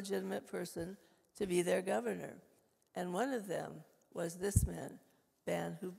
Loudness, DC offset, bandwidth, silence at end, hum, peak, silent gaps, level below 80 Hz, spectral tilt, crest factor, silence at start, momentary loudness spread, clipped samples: -39 LUFS; under 0.1%; 16 kHz; 0 s; none; -16 dBFS; none; -52 dBFS; -5.5 dB/octave; 24 dB; 0 s; 15 LU; under 0.1%